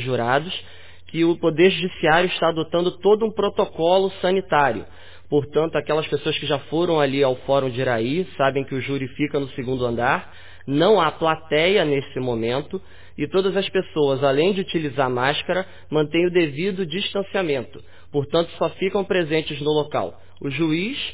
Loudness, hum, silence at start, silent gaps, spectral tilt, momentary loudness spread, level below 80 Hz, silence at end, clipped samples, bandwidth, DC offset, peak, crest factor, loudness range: -21 LUFS; none; 0 s; none; -10 dB/octave; 8 LU; -52 dBFS; 0 s; under 0.1%; 4 kHz; 1%; -4 dBFS; 16 dB; 3 LU